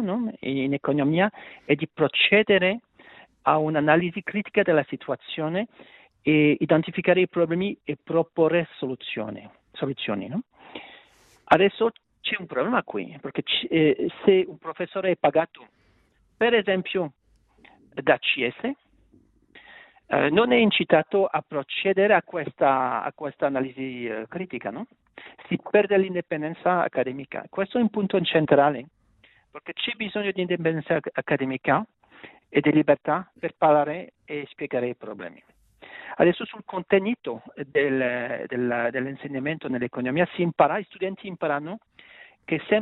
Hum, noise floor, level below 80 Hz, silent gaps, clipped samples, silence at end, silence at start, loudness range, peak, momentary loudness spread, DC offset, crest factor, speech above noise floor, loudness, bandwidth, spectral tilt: none; -64 dBFS; -64 dBFS; none; under 0.1%; 0 s; 0 s; 5 LU; -4 dBFS; 14 LU; under 0.1%; 20 dB; 40 dB; -24 LUFS; 4.1 kHz; -8.5 dB/octave